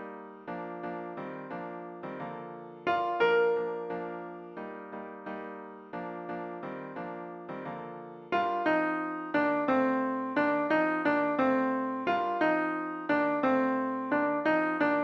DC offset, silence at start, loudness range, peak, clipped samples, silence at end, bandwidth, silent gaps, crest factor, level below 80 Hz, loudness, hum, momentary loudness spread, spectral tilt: under 0.1%; 0 s; 12 LU; -14 dBFS; under 0.1%; 0 s; 7 kHz; none; 16 dB; -74 dBFS; -30 LUFS; none; 14 LU; -7.5 dB/octave